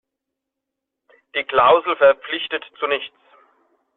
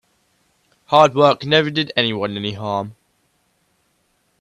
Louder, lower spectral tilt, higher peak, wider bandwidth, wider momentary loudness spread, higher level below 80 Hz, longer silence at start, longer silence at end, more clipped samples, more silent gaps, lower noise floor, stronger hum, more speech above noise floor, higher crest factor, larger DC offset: about the same, -18 LUFS vs -17 LUFS; second, 0.5 dB/octave vs -5.5 dB/octave; about the same, -2 dBFS vs 0 dBFS; second, 4.1 kHz vs 10.5 kHz; about the same, 12 LU vs 12 LU; about the same, -62 dBFS vs -60 dBFS; first, 1.35 s vs 0.9 s; second, 0.9 s vs 1.5 s; neither; neither; first, -82 dBFS vs -65 dBFS; neither; first, 64 dB vs 48 dB; about the same, 18 dB vs 20 dB; neither